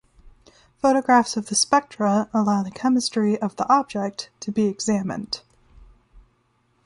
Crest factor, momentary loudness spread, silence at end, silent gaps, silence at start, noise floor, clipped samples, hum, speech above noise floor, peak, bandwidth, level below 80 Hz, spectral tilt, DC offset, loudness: 18 dB; 10 LU; 0.65 s; none; 0.25 s; -65 dBFS; under 0.1%; none; 44 dB; -4 dBFS; 11.5 kHz; -56 dBFS; -4 dB/octave; under 0.1%; -22 LUFS